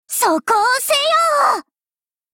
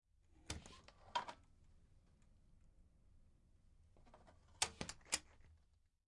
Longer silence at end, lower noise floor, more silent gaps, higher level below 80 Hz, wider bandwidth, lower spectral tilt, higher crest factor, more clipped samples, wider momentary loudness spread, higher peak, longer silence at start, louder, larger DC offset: first, 0.7 s vs 0.5 s; first, under -90 dBFS vs -76 dBFS; neither; about the same, -64 dBFS vs -68 dBFS; first, 17 kHz vs 11 kHz; about the same, 0 dB/octave vs -1 dB/octave; second, 12 dB vs 34 dB; neither; second, 4 LU vs 19 LU; first, -4 dBFS vs -20 dBFS; second, 0.1 s vs 0.3 s; first, -15 LUFS vs -46 LUFS; neither